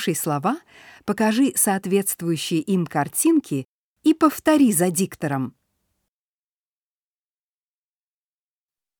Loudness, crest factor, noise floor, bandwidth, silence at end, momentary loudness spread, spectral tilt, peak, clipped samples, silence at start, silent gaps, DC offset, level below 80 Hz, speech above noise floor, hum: -21 LUFS; 18 dB; under -90 dBFS; over 20 kHz; 3.5 s; 11 LU; -4.5 dB/octave; -4 dBFS; under 0.1%; 0 s; 3.65-3.96 s; under 0.1%; -66 dBFS; over 69 dB; none